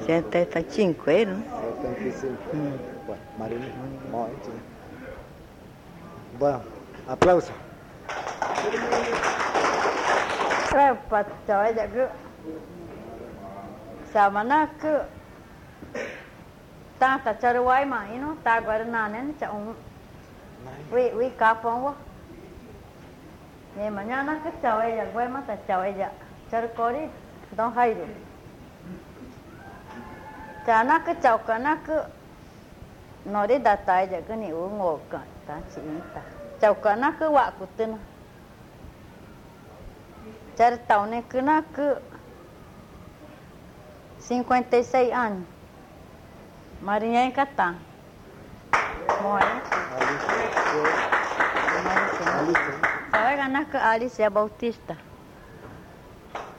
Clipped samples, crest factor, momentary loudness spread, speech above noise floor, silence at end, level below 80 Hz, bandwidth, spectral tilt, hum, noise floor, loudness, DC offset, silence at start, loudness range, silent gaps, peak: under 0.1%; 22 dB; 23 LU; 23 dB; 0 s; -54 dBFS; 16.5 kHz; -5 dB/octave; none; -47 dBFS; -25 LUFS; under 0.1%; 0 s; 7 LU; none; -4 dBFS